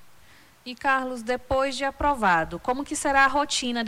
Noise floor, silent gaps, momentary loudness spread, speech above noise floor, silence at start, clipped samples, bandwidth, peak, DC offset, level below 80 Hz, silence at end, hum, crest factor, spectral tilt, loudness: -54 dBFS; none; 9 LU; 30 dB; 0 s; under 0.1%; 17.5 kHz; -10 dBFS; under 0.1%; -46 dBFS; 0 s; none; 16 dB; -3 dB/octave; -24 LUFS